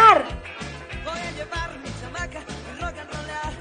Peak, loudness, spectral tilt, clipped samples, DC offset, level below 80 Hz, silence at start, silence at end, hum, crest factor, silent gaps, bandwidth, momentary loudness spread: -2 dBFS; -27 LUFS; -4 dB/octave; under 0.1%; under 0.1%; -40 dBFS; 0 s; 0 s; none; 22 dB; none; 10 kHz; 9 LU